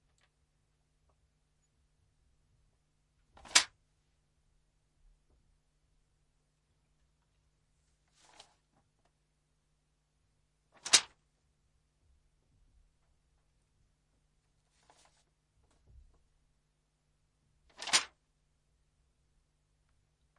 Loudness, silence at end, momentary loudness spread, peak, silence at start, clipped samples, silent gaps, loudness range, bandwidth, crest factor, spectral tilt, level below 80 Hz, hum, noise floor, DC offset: -28 LUFS; 2.35 s; 21 LU; -6 dBFS; 3.55 s; under 0.1%; none; 4 LU; 11 kHz; 36 dB; 2 dB/octave; -74 dBFS; none; -78 dBFS; under 0.1%